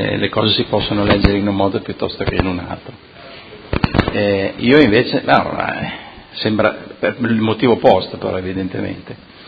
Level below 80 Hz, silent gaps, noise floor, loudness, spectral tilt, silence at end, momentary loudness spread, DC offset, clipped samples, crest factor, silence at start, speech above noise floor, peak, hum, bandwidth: -32 dBFS; none; -36 dBFS; -16 LUFS; -8.5 dB/octave; 0 s; 17 LU; under 0.1%; under 0.1%; 16 dB; 0 s; 20 dB; 0 dBFS; none; 6.8 kHz